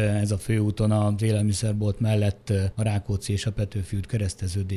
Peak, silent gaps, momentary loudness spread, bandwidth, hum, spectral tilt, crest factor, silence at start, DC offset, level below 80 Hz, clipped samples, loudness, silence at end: -10 dBFS; none; 6 LU; 12 kHz; none; -6.5 dB/octave; 14 dB; 0 s; under 0.1%; -44 dBFS; under 0.1%; -25 LUFS; 0 s